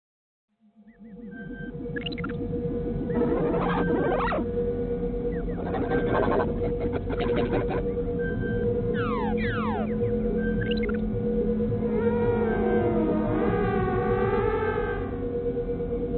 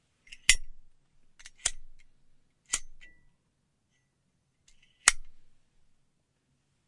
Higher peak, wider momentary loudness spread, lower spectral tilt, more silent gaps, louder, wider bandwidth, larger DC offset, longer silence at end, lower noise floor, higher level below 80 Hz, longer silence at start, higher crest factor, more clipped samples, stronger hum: second, -12 dBFS vs 0 dBFS; second, 6 LU vs 9 LU; first, -11.5 dB/octave vs 2 dB/octave; neither; about the same, -27 LUFS vs -28 LUFS; second, 4.4 kHz vs 11.5 kHz; neither; second, 0 s vs 1.45 s; second, -55 dBFS vs -76 dBFS; first, -38 dBFS vs -48 dBFS; first, 0.85 s vs 0.3 s; second, 14 dB vs 36 dB; neither; neither